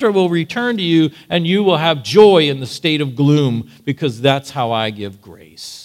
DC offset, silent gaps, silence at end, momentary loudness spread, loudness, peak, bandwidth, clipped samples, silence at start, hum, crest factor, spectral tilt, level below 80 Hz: under 0.1%; none; 0 s; 13 LU; -15 LUFS; 0 dBFS; 15 kHz; under 0.1%; 0 s; none; 16 dB; -6 dB/octave; -60 dBFS